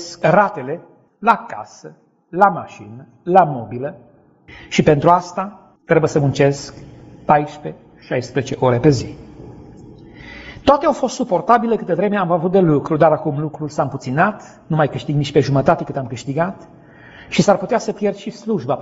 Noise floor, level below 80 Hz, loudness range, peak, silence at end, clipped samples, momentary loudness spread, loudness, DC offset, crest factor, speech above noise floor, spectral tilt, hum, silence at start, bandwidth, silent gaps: -41 dBFS; -48 dBFS; 3 LU; 0 dBFS; 0 s; under 0.1%; 18 LU; -17 LUFS; under 0.1%; 18 dB; 24 dB; -6 dB/octave; none; 0 s; 8 kHz; none